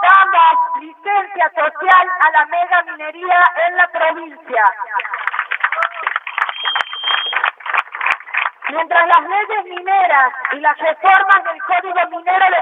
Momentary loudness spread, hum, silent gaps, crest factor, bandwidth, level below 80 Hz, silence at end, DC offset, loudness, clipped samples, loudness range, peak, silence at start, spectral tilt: 9 LU; none; none; 14 dB; 7.6 kHz; -78 dBFS; 0 s; under 0.1%; -14 LUFS; under 0.1%; 4 LU; 0 dBFS; 0 s; -1 dB/octave